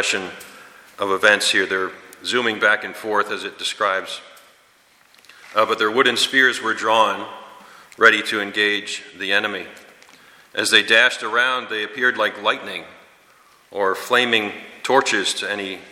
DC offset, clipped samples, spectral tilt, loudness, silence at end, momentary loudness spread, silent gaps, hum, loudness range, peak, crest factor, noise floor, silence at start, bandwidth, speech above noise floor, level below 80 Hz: under 0.1%; under 0.1%; -1.5 dB/octave; -18 LUFS; 0 s; 15 LU; none; none; 5 LU; 0 dBFS; 20 dB; -55 dBFS; 0 s; 16.5 kHz; 35 dB; -70 dBFS